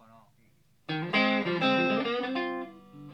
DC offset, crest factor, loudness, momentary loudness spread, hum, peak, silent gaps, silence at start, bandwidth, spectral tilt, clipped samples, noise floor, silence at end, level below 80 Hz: under 0.1%; 16 dB; -28 LUFS; 18 LU; none; -14 dBFS; none; 0.9 s; 8.4 kHz; -6.5 dB/octave; under 0.1%; -66 dBFS; 0 s; -76 dBFS